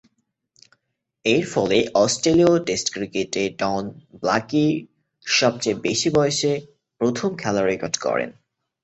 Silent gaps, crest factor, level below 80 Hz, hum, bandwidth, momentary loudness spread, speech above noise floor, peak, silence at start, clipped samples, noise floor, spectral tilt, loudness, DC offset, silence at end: none; 18 dB; -56 dBFS; none; 8.4 kHz; 9 LU; 55 dB; -4 dBFS; 1.25 s; under 0.1%; -75 dBFS; -4 dB/octave; -21 LUFS; under 0.1%; 0.55 s